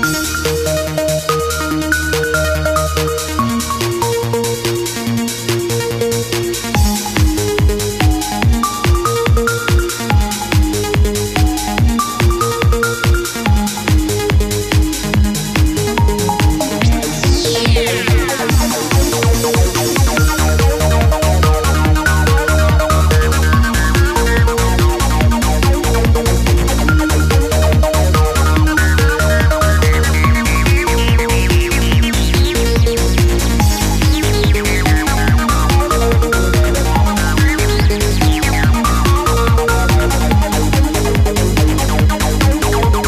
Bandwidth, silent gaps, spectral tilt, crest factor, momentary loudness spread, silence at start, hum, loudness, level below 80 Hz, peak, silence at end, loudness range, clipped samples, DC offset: 15.5 kHz; none; -5 dB/octave; 12 dB; 4 LU; 0 s; none; -14 LUFS; -16 dBFS; 0 dBFS; 0 s; 3 LU; under 0.1%; under 0.1%